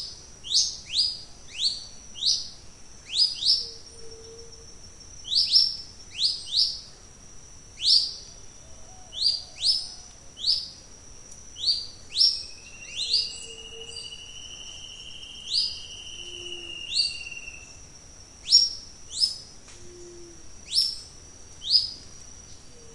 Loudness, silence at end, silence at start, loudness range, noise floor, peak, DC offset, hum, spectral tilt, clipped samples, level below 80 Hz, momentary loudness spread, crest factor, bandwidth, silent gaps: -23 LUFS; 0 s; 0 s; 6 LU; -47 dBFS; -4 dBFS; under 0.1%; none; 0.5 dB/octave; under 0.1%; -54 dBFS; 25 LU; 26 dB; 11.5 kHz; none